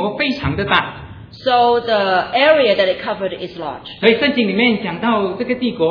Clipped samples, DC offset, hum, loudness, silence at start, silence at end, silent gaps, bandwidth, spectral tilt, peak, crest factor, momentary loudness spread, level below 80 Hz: under 0.1%; under 0.1%; none; -16 LUFS; 0 s; 0 s; none; 5.4 kHz; -7 dB/octave; 0 dBFS; 16 dB; 14 LU; -44 dBFS